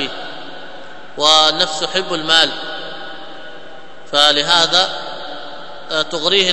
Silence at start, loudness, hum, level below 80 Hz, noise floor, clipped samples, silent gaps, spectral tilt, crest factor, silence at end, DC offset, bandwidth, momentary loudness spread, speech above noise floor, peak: 0 s; -13 LUFS; none; -58 dBFS; -38 dBFS; 0.2%; none; -1.5 dB/octave; 18 dB; 0 s; 3%; 11 kHz; 23 LU; 23 dB; 0 dBFS